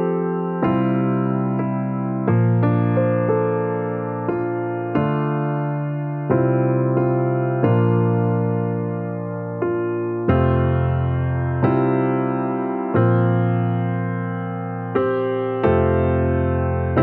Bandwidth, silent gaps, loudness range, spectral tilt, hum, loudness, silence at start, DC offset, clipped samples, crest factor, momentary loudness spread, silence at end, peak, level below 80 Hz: 4 kHz; none; 2 LU; -12.5 dB/octave; none; -20 LUFS; 0 s; under 0.1%; under 0.1%; 16 dB; 7 LU; 0 s; -4 dBFS; -42 dBFS